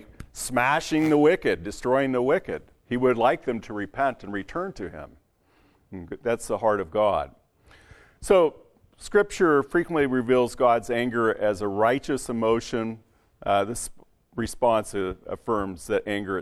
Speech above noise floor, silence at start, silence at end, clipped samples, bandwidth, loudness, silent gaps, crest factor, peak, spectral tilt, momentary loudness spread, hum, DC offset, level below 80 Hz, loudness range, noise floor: 39 dB; 0 s; 0 s; under 0.1%; 14.5 kHz; -25 LUFS; none; 18 dB; -8 dBFS; -5 dB/octave; 14 LU; none; under 0.1%; -50 dBFS; 6 LU; -63 dBFS